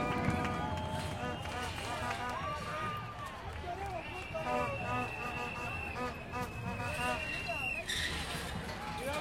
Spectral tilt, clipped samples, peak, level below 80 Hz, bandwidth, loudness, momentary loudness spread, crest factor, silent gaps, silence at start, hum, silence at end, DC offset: -4.5 dB/octave; under 0.1%; -18 dBFS; -52 dBFS; 16.5 kHz; -37 LUFS; 6 LU; 20 dB; none; 0 s; none; 0 s; under 0.1%